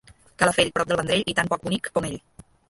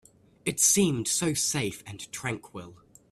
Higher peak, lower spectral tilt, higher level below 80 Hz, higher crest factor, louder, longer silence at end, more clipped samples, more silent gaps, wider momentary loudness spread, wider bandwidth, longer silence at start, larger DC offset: first, -2 dBFS vs -8 dBFS; about the same, -3.5 dB/octave vs -3 dB/octave; first, -52 dBFS vs -62 dBFS; about the same, 22 dB vs 20 dB; first, -23 LUFS vs -26 LUFS; first, 0.5 s vs 0.35 s; neither; neither; second, 8 LU vs 19 LU; second, 12 kHz vs 15.5 kHz; about the same, 0.4 s vs 0.45 s; neither